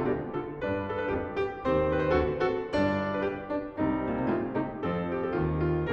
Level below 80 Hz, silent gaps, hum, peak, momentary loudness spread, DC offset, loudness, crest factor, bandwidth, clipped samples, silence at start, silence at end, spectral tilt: -46 dBFS; none; none; -12 dBFS; 6 LU; under 0.1%; -30 LUFS; 16 dB; 8 kHz; under 0.1%; 0 s; 0 s; -8.5 dB/octave